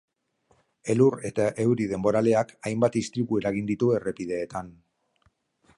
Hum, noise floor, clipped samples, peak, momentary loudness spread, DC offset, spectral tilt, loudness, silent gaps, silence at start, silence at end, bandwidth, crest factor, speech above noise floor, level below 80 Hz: none; -68 dBFS; under 0.1%; -8 dBFS; 9 LU; under 0.1%; -7 dB/octave; -25 LUFS; none; 0.85 s; 1.05 s; 11.5 kHz; 18 dB; 44 dB; -60 dBFS